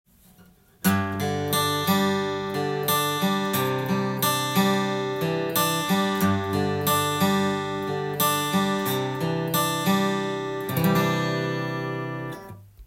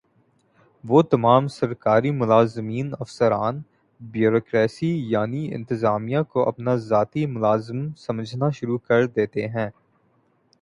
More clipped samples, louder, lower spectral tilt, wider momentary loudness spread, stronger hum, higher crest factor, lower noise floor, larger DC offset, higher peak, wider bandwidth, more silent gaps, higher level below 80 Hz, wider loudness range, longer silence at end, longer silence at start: neither; about the same, -24 LUFS vs -22 LUFS; second, -4.5 dB/octave vs -8 dB/octave; second, 6 LU vs 11 LU; neither; about the same, 18 dB vs 20 dB; second, -55 dBFS vs -64 dBFS; neither; second, -8 dBFS vs -2 dBFS; first, 16.5 kHz vs 11 kHz; neither; about the same, -60 dBFS vs -60 dBFS; about the same, 1 LU vs 3 LU; second, 0 s vs 0.9 s; about the same, 0.85 s vs 0.85 s